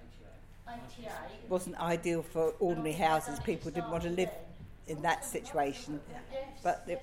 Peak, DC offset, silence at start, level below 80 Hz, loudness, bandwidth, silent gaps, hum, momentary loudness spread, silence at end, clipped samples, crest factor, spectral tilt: -16 dBFS; under 0.1%; 0 s; -54 dBFS; -35 LUFS; 16.5 kHz; none; none; 16 LU; 0 s; under 0.1%; 20 dB; -5 dB/octave